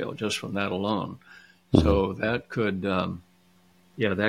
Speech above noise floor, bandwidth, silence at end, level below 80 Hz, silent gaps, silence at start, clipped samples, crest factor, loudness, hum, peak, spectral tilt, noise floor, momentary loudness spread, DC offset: 35 dB; 15 kHz; 0 s; -42 dBFS; none; 0 s; under 0.1%; 24 dB; -27 LUFS; none; -2 dBFS; -6 dB/octave; -61 dBFS; 11 LU; under 0.1%